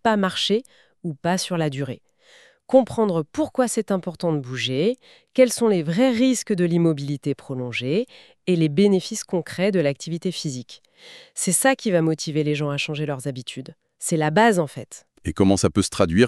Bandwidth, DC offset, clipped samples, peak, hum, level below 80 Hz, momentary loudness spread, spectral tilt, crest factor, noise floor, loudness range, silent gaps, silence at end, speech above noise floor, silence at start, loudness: 13.5 kHz; under 0.1%; under 0.1%; -4 dBFS; none; -54 dBFS; 14 LU; -5 dB/octave; 18 dB; -54 dBFS; 2 LU; none; 0 s; 32 dB; 0.05 s; -22 LUFS